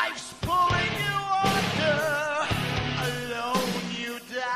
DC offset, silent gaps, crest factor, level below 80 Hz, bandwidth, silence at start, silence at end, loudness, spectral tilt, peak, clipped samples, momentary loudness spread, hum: under 0.1%; none; 18 dB; -48 dBFS; 15.5 kHz; 0 s; 0 s; -26 LUFS; -4 dB/octave; -10 dBFS; under 0.1%; 8 LU; none